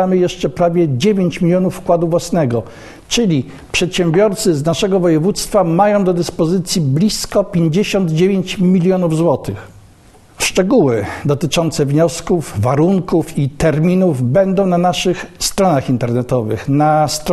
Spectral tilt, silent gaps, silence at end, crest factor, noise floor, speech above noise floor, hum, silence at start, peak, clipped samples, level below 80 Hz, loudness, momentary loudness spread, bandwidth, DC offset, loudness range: -5.5 dB/octave; none; 0 s; 14 dB; -44 dBFS; 30 dB; none; 0 s; 0 dBFS; under 0.1%; -38 dBFS; -15 LUFS; 6 LU; 13 kHz; under 0.1%; 2 LU